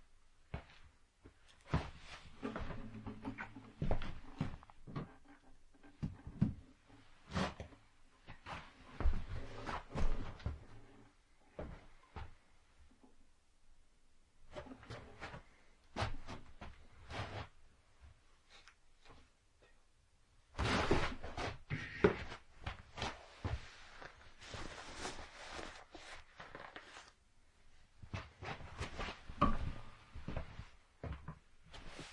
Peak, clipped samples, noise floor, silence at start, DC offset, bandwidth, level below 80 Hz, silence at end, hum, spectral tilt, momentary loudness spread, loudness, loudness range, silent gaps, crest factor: -14 dBFS; under 0.1%; -70 dBFS; 0 s; under 0.1%; 11 kHz; -48 dBFS; 0 s; none; -5.5 dB/octave; 24 LU; -45 LUFS; 15 LU; none; 30 dB